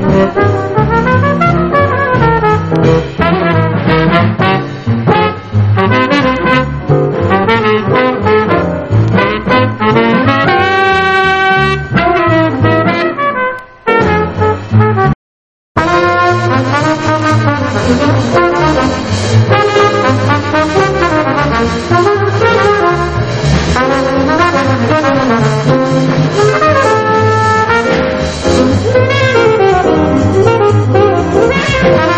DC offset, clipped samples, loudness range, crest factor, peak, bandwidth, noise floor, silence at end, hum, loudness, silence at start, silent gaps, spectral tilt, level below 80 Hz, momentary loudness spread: under 0.1%; 0.4%; 2 LU; 10 dB; 0 dBFS; 8.8 kHz; under -90 dBFS; 0 s; none; -10 LUFS; 0 s; 15.15-15.75 s; -6.5 dB/octave; -30 dBFS; 4 LU